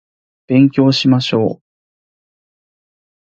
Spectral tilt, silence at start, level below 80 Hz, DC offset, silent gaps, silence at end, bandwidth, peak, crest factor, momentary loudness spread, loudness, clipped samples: -7 dB/octave; 0.5 s; -56 dBFS; under 0.1%; none; 1.75 s; 7.6 kHz; 0 dBFS; 16 dB; 8 LU; -13 LUFS; under 0.1%